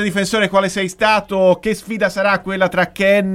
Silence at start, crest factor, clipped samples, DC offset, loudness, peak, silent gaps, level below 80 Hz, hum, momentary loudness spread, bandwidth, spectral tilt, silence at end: 0 s; 14 dB; under 0.1%; under 0.1%; -16 LUFS; -2 dBFS; none; -48 dBFS; none; 5 LU; 16 kHz; -4.5 dB/octave; 0 s